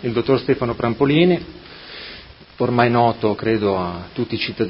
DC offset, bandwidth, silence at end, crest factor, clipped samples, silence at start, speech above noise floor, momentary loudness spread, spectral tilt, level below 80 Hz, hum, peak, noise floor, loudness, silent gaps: under 0.1%; 5.8 kHz; 0 s; 20 dB; under 0.1%; 0 s; 22 dB; 20 LU; -10 dB/octave; -46 dBFS; none; 0 dBFS; -40 dBFS; -19 LUFS; none